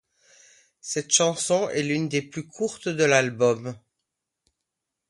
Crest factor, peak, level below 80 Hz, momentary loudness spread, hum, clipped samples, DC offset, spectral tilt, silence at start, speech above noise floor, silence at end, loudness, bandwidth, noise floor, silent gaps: 22 dB; -4 dBFS; -70 dBFS; 11 LU; none; under 0.1%; under 0.1%; -3 dB/octave; 0.85 s; 59 dB; 1.3 s; -23 LUFS; 11.5 kHz; -83 dBFS; none